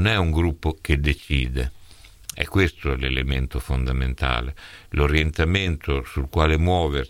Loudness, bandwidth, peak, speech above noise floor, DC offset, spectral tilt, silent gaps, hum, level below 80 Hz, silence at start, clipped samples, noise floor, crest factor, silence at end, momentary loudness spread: -23 LUFS; 15 kHz; -2 dBFS; 24 dB; under 0.1%; -6 dB/octave; none; none; -28 dBFS; 0 s; under 0.1%; -46 dBFS; 20 dB; 0 s; 9 LU